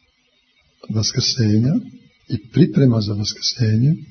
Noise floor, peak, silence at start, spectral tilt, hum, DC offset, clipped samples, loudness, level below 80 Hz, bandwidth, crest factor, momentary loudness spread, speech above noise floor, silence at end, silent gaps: -62 dBFS; -2 dBFS; 0.9 s; -5.5 dB/octave; none; under 0.1%; under 0.1%; -18 LUFS; -52 dBFS; 6.6 kHz; 18 dB; 9 LU; 44 dB; 0.05 s; none